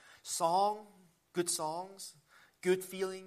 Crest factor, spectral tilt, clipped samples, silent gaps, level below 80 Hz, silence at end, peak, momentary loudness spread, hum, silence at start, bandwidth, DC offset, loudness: 18 dB; -3.5 dB/octave; under 0.1%; none; -84 dBFS; 0 s; -18 dBFS; 15 LU; none; 0.1 s; 15 kHz; under 0.1%; -35 LUFS